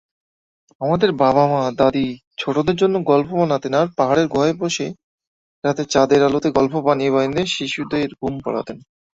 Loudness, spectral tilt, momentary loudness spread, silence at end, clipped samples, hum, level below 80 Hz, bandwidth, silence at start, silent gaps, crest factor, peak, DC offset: -18 LUFS; -5.5 dB/octave; 10 LU; 0.4 s; under 0.1%; none; -52 dBFS; 7.8 kHz; 0.8 s; 2.27-2.31 s, 5.04-5.18 s, 5.27-5.62 s; 18 dB; -2 dBFS; under 0.1%